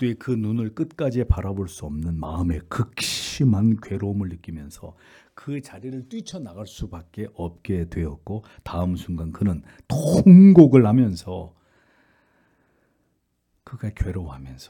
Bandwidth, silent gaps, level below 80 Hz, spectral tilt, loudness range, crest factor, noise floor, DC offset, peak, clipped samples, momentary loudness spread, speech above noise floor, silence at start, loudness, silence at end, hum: 13.5 kHz; none; -40 dBFS; -7.5 dB/octave; 18 LU; 20 dB; -71 dBFS; under 0.1%; 0 dBFS; under 0.1%; 22 LU; 50 dB; 0 s; -20 LUFS; 0.05 s; none